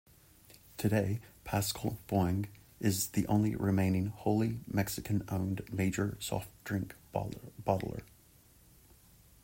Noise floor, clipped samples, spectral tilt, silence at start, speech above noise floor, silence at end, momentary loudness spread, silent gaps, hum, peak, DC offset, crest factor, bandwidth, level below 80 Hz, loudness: -62 dBFS; under 0.1%; -6 dB/octave; 0.8 s; 29 dB; 1.4 s; 9 LU; none; none; -16 dBFS; under 0.1%; 20 dB; 16.5 kHz; -58 dBFS; -34 LUFS